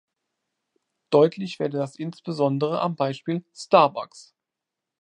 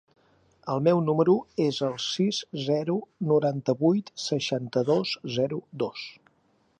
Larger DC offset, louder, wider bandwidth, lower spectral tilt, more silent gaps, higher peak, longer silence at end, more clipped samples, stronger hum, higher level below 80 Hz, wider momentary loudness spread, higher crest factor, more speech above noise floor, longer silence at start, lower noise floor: neither; first, -23 LUFS vs -26 LUFS; about the same, 10.5 kHz vs 10 kHz; about the same, -6.5 dB/octave vs -6 dB/octave; neither; first, -2 dBFS vs -8 dBFS; first, 0.8 s vs 0.65 s; neither; neither; second, -78 dBFS vs -70 dBFS; first, 13 LU vs 9 LU; first, 24 dB vs 18 dB; first, 63 dB vs 41 dB; first, 1.1 s vs 0.65 s; first, -86 dBFS vs -67 dBFS